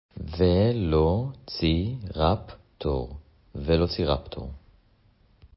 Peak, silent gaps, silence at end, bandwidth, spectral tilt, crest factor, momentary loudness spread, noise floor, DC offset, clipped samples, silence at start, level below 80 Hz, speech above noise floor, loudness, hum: -8 dBFS; none; 0.1 s; 5.8 kHz; -11 dB/octave; 18 dB; 17 LU; -61 dBFS; under 0.1%; under 0.1%; 0.15 s; -36 dBFS; 36 dB; -26 LUFS; none